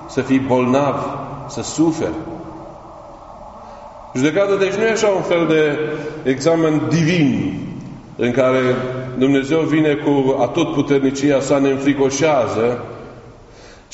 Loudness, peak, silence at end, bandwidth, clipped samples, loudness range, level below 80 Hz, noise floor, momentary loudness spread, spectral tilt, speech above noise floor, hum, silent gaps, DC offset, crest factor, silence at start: -17 LUFS; -2 dBFS; 0.2 s; 8 kHz; under 0.1%; 5 LU; -48 dBFS; -41 dBFS; 20 LU; -5.5 dB/octave; 25 dB; none; none; under 0.1%; 16 dB; 0 s